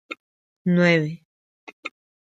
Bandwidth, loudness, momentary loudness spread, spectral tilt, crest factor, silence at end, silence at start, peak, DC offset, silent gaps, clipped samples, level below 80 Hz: 7.8 kHz; -21 LUFS; 21 LU; -7 dB/octave; 20 dB; 0.4 s; 0.1 s; -4 dBFS; under 0.1%; 0.20-0.65 s, 1.25-1.67 s, 1.73-1.83 s; under 0.1%; -70 dBFS